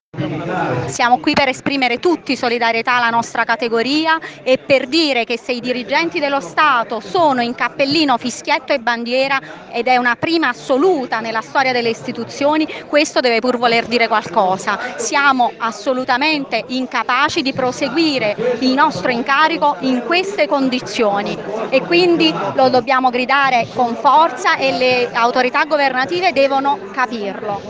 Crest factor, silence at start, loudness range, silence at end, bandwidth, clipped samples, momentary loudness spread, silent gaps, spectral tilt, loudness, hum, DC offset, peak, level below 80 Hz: 16 dB; 0.15 s; 2 LU; 0 s; 9.8 kHz; under 0.1%; 7 LU; none; -4 dB/octave; -16 LUFS; none; under 0.1%; 0 dBFS; -58 dBFS